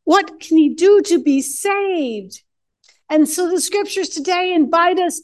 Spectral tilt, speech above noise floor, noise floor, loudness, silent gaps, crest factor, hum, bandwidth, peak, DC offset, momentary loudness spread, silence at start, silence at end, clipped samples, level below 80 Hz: -2 dB/octave; 42 dB; -58 dBFS; -16 LUFS; none; 16 dB; none; 12.5 kHz; 0 dBFS; under 0.1%; 8 LU; 0.05 s; 0.05 s; under 0.1%; -68 dBFS